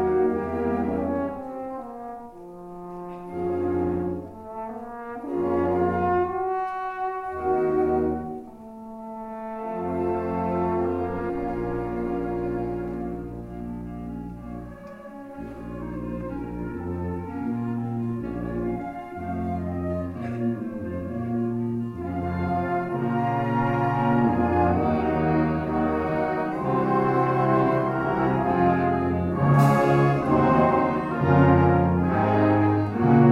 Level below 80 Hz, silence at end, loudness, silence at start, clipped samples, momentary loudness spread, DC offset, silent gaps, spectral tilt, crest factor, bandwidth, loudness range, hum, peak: -48 dBFS; 0 s; -25 LUFS; 0 s; under 0.1%; 16 LU; under 0.1%; none; -9.5 dB/octave; 20 dB; 13 kHz; 11 LU; none; -4 dBFS